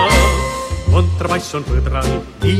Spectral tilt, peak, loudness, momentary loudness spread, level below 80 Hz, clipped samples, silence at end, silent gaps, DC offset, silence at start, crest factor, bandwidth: -5 dB/octave; 0 dBFS; -17 LUFS; 8 LU; -20 dBFS; under 0.1%; 0 s; none; under 0.1%; 0 s; 14 dB; 15.5 kHz